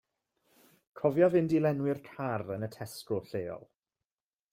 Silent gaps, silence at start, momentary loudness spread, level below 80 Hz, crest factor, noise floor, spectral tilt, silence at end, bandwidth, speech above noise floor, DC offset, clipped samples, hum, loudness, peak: none; 0.95 s; 15 LU; -70 dBFS; 20 dB; under -90 dBFS; -7.5 dB/octave; 0.95 s; 16 kHz; over 60 dB; under 0.1%; under 0.1%; none; -31 LUFS; -12 dBFS